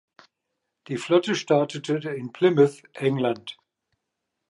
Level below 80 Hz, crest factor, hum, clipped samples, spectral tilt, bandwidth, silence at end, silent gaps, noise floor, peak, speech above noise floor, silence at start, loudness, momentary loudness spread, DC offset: -76 dBFS; 18 dB; none; under 0.1%; -6 dB/octave; 11.5 kHz; 0.95 s; none; -81 dBFS; -6 dBFS; 58 dB; 0.9 s; -24 LUFS; 13 LU; under 0.1%